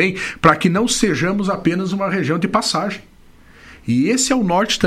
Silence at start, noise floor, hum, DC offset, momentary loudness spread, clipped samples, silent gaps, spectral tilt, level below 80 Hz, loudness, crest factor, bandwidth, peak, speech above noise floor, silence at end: 0 s; -45 dBFS; none; under 0.1%; 6 LU; under 0.1%; none; -4.5 dB/octave; -44 dBFS; -17 LUFS; 18 dB; 15 kHz; 0 dBFS; 28 dB; 0 s